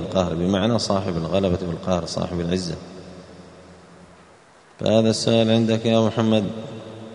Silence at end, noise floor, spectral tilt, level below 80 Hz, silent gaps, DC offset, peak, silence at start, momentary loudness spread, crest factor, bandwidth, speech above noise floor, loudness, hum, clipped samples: 0 s; -51 dBFS; -6 dB/octave; -50 dBFS; none; under 0.1%; -4 dBFS; 0 s; 17 LU; 18 dB; 11 kHz; 30 dB; -21 LUFS; none; under 0.1%